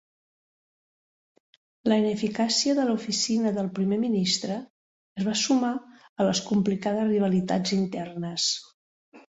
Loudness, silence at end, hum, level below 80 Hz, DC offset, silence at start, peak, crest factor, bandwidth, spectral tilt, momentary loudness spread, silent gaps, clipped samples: -26 LUFS; 0.2 s; none; -66 dBFS; under 0.1%; 1.85 s; -10 dBFS; 18 dB; 8 kHz; -4.5 dB/octave; 9 LU; 4.70-5.15 s, 6.09-6.16 s, 8.74-9.12 s; under 0.1%